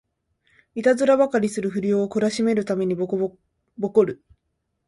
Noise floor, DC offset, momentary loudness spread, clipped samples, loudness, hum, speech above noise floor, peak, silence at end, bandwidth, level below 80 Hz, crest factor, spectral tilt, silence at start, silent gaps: -75 dBFS; under 0.1%; 10 LU; under 0.1%; -22 LUFS; none; 54 dB; -6 dBFS; 0.7 s; 11.5 kHz; -64 dBFS; 16 dB; -6 dB/octave; 0.75 s; none